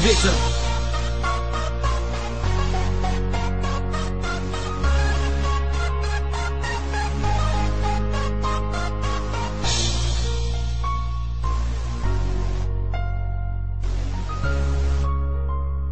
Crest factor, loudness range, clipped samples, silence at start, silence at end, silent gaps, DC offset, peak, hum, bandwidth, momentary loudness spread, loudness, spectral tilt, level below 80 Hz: 18 dB; 3 LU; under 0.1%; 0 s; 0 s; none; 3%; -4 dBFS; none; 9 kHz; 5 LU; -25 LUFS; -5 dB/octave; -24 dBFS